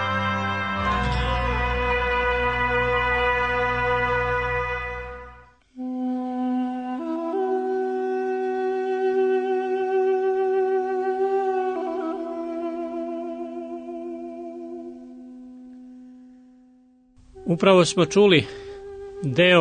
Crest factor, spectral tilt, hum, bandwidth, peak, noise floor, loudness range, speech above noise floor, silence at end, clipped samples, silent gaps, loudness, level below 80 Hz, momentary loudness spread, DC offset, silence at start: 20 dB; -5.5 dB/octave; none; 9.6 kHz; -4 dBFS; -56 dBFS; 13 LU; 38 dB; 0 s; under 0.1%; none; -23 LUFS; -38 dBFS; 17 LU; under 0.1%; 0 s